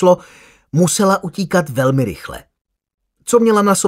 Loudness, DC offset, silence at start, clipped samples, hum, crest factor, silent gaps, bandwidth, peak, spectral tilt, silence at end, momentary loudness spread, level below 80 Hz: -15 LUFS; under 0.1%; 0 s; under 0.1%; none; 16 dB; 2.61-2.65 s, 2.94-2.98 s; 16 kHz; 0 dBFS; -5.5 dB/octave; 0 s; 18 LU; -50 dBFS